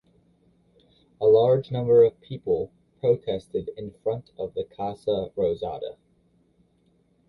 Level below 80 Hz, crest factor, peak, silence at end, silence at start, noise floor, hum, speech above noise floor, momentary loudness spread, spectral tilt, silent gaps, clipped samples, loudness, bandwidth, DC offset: -58 dBFS; 18 dB; -8 dBFS; 1.35 s; 1.2 s; -65 dBFS; none; 41 dB; 15 LU; -9 dB/octave; none; under 0.1%; -25 LUFS; 5.2 kHz; under 0.1%